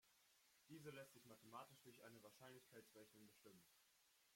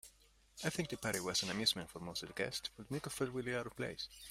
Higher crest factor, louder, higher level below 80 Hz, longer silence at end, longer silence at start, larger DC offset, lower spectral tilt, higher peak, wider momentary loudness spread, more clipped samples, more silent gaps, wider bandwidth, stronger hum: about the same, 20 dB vs 22 dB; second, -64 LUFS vs -40 LUFS; second, under -90 dBFS vs -66 dBFS; about the same, 0 s vs 0 s; about the same, 0 s vs 0.05 s; neither; about the same, -4 dB/octave vs -3 dB/octave; second, -46 dBFS vs -20 dBFS; about the same, 8 LU vs 10 LU; neither; neither; about the same, 16.5 kHz vs 16 kHz; neither